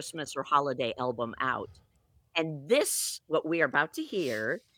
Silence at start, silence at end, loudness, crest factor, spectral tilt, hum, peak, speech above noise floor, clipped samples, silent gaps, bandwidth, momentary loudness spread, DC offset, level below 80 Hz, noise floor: 0 s; 0.2 s; -30 LUFS; 20 dB; -3 dB/octave; none; -10 dBFS; 27 dB; under 0.1%; none; 19 kHz; 8 LU; under 0.1%; -70 dBFS; -58 dBFS